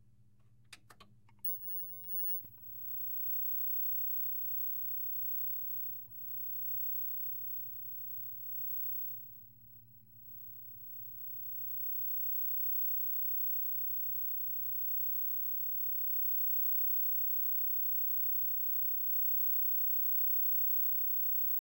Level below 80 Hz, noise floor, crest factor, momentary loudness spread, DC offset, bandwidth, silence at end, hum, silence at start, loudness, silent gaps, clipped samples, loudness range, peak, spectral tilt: -78 dBFS; -67 dBFS; 8 dB; 12 LU; under 0.1%; 16 kHz; 0 s; none; 0.7 s; -32 LUFS; none; under 0.1%; 10 LU; -28 dBFS; -5 dB/octave